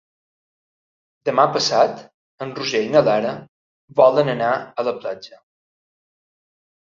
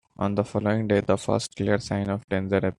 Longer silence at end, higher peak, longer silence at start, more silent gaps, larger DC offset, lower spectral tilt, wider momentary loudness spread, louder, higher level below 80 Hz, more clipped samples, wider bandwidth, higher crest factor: first, 1.5 s vs 0.05 s; first, -2 dBFS vs -8 dBFS; first, 1.25 s vs 0.2 s; first, 2.14-2.38 s, 3.48-3.88 s vs 2.24-2.28 s; neither; second, -4.5 dB/octave vs -6.5 dB/octave; first, 16 LU vs 5 LU; first, -19 LUFS vs -25 LUFS; second, -66 dBFS vs -56 dBFS; neither; second, 7.6 kHz vs 11 kHz; about the same, 20 dB vs 18 dB